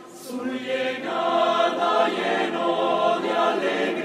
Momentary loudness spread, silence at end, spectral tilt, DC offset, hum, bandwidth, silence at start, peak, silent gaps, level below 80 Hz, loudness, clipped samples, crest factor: 7 LU; 0 s; -4 dB/octave; under 0.1%; none; 15 kHz; 0 s; -8 dBFS; none; -74 dBFS; -23 LUFS; under 0.1%; 14 dB